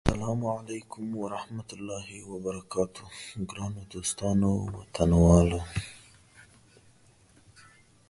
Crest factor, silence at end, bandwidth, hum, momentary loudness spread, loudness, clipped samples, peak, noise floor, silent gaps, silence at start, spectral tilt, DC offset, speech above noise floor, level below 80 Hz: 24 dB; 1.65 s; 11.5 kHz; none; 17 LU; -29 LUFS; under 0.1%; -4 dBFS; -60 dBFS; none; 0.05 s; -6.5 dB/octave; under 0.1%; 31 dB; -40 dBFS